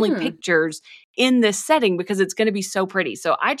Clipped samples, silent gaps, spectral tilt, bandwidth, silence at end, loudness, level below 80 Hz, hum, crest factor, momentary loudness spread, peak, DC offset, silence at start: under 0.1%; 1.04-1.14 s; -4 dB/octave; 15.5 kHz; 0 s; -20 LUFS; -74 dBFS; none; 16 dB; 6 LU; -4 dBFS; under 0.1%; 0 s